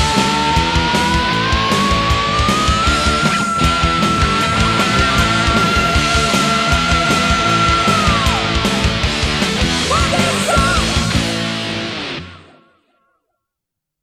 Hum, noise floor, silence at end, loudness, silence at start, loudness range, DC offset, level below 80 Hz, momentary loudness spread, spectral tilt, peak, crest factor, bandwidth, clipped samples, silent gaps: none; -81 dBFS; 1.65 s; -14 LUFS; 0 s; 4 LU; under 0.1%; -24 dBFS; 3 LU; -4 dB/octave; -2 dBFS; 14 dB; 15 kHz; under 0.1%; none